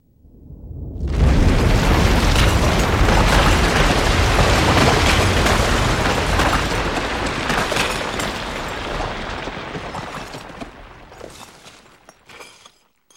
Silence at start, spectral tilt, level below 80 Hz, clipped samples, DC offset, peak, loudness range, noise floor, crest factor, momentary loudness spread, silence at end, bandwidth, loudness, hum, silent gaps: 0.45 s; -4.5 dB/octave; -24 dBFS; under 0.1%; under 0.1%; -2 dBFS; 16 LU; -53 dBFS; 16 dB; 19 LU; 0.7 s; 16.5 kHz; -18 LUFS; none; none